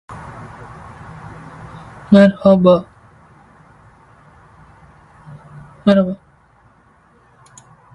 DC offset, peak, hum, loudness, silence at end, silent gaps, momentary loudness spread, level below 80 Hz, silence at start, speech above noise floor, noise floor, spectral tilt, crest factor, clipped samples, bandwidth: under 0.1%; 0 dBFS; none; -13 LUFS; 1.8 s; none; 26 LU; -50 dBFS; 0.1 s; 41 dB; -52 dBFS; -8.5 dB/octave; 20 dB; under 0.1%; 8.6 kHz